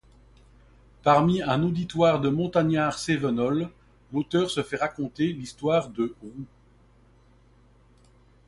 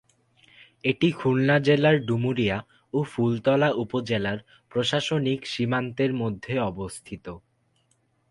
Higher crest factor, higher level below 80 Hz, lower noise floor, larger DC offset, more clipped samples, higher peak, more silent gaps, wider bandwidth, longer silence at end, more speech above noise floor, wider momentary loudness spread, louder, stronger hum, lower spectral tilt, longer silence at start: about the same, 20 dB vs 18 dB; about the same, -56 dBFS vs -56 dBFS; second, -57 dBFS vs -68 dBFS; neither; neither; about the same, -6 dBFS vs -8 dBFS; neither; about the same, 11.5 kHz vs 11.5 kHz; first, 2 s vs 0.95 s; second, 33 dB vs 44 dB; second, 11 LU vs 15 LU; about the same, -25 LUFS vs -25 LUFS; neither; about the same, -6.5 dB/octave vs -6.5 dB/octave; first, 1.05 s vs 0.85 s